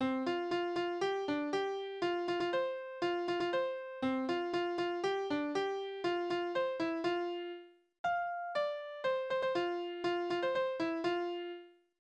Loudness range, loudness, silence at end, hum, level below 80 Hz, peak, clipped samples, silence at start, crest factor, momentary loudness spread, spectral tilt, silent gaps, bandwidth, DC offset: 1 LU; -36 LUFS; 0.3 s; none; -76 dBFS; -22 dBFS; under 0.1%; 0 s; 14 dB; 4 LU; -5 dB/octave; 7.99-8.04 s; 8.8 kHz; under 0.1%